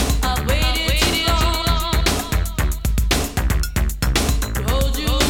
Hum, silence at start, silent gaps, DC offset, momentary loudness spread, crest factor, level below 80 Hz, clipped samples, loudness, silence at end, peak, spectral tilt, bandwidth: none; 0 s; none; under 0.1%; 5 LU; 16 dB; -20 dBFS; under 0.1%; -20 LUFS; 0 s; -2 dBFS; -4 dB/octave; 18 kHz